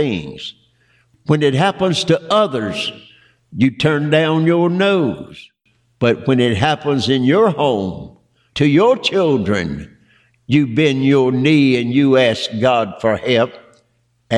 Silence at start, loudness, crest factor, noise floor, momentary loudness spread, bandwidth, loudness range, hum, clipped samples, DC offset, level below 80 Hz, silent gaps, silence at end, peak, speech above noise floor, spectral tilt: 0 s; -15 LUFS; 14 dB; -62 dBFS; 12 LU; 11 kHz; 3 LU; none; under 0.1%; under 0.1%; -50 dBFS; none; 0 s; -2 dBFS; 47 dB; -6.5 dB/octave